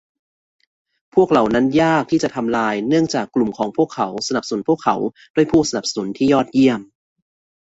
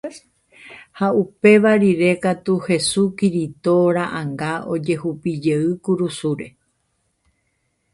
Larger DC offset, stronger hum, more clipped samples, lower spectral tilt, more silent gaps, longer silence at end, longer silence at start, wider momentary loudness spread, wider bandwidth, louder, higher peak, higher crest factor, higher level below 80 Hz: neither; neither; neither; about the same, -5 dB/octave vs -6 dB/octave; first, 5.30-5.34 s vs none; second, 0.9 s vs 1.45 s; first, 1.15 s vs 0.05 s; second, 7 LU vs 11 LU; second, 8 kHz vs 11.5 kHz; about the same, -18 LUFS vs -19 LUFS; about the same, -2 dBFS vs -2 dBFS; about the same, 16 dB vs 18 dB; first, -52 dBFS vs -58 dBFS